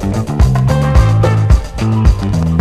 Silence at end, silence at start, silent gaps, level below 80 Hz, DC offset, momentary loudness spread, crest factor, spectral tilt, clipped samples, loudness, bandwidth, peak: 0 s; 0 s; none; -14 dBFS; under 0.1%; 4 LU; 10 dB; -7.5 dB/octave; 0.3%; -12 LUFS; 13 kHz; 0 dBFS